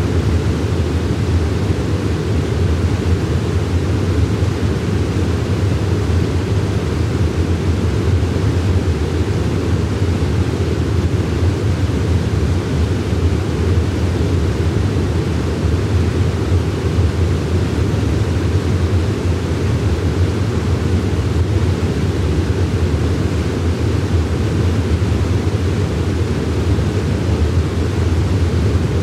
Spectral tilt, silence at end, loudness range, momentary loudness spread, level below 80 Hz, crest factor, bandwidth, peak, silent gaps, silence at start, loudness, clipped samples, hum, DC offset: -7 dB/octave; 0 s; 0 LU; 2 LU; -26 dBFS; 10 dB; 12 kHz; -4 dBFS; none; 0 s; -17 LUFS; under 0.1%; none; under 0.1%